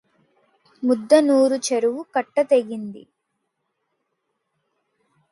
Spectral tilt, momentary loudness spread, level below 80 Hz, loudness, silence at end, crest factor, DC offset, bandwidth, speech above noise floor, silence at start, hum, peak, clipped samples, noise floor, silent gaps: -4 dB/octave; 14 LU; -76 dBFS; -19 LUFS; 2.3 s; 20 dB; under 0.1%; 11.5 kHz; 57 dB; 0.8 s; none; -2 dBFS; under 0.1%; -76 dBFS; none